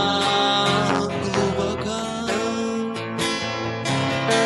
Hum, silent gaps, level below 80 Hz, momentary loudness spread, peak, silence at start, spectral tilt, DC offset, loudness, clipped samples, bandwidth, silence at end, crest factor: none; none; -50 dBFS; 8 LU; -2 dBFS; 0 s; -4 dB/octave; under 0.1%; -22 LUFS; under 0.1%; 11.5 kHz; 0 s; 20 dB